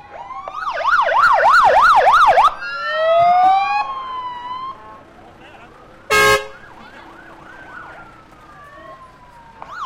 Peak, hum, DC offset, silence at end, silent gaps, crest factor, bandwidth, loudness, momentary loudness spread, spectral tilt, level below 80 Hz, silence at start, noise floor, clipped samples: -4 dBFS; none; under 0.1%; 0 s; none; 12 dB; 16.5 kHz; -13 LUFS; 23 LU; -2 dB/octave; -46 dBFS; 0.1 s; -43 dBFS; under 0.1%